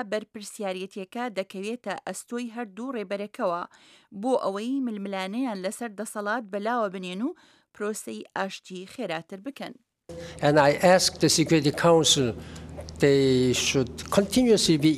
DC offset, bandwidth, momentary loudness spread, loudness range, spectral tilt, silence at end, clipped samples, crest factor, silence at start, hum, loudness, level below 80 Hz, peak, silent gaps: under 0.1%; 15.5 kHz; 19 LU; 11 LU; -4 dB/octave; 0 s; under 0.1%; 20 dB; 0 s; none; -25 LUFS; -54 dBFS; -6 dBFS; none